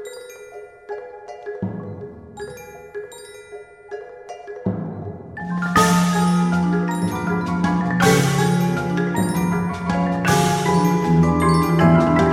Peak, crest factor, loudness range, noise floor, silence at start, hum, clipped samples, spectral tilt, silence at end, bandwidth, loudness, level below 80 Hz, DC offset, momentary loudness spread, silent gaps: -2 dBFS; 18 dB; 15 LU; -40 dBFS; 0 s; none; under 0.1%; -6 dB/octave; 0 s; 15.5 kHz; -19 LUFS; -42 dBFS; under 0.1%; 21 LU; none